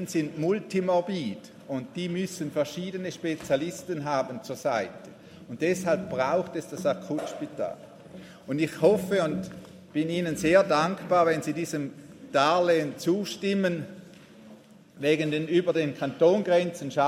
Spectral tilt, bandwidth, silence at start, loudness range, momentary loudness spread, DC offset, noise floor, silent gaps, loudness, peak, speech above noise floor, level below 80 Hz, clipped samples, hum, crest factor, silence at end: -5.5 dB/octave; 16 kHz; 0 s; 6 LU; 14 LU; under 0.1%; -51 dBFS; none; -27 LUFS; -8 dBFS; 25 dB; -66 dBFS; under 0.1%; none; 20 dB; 0 s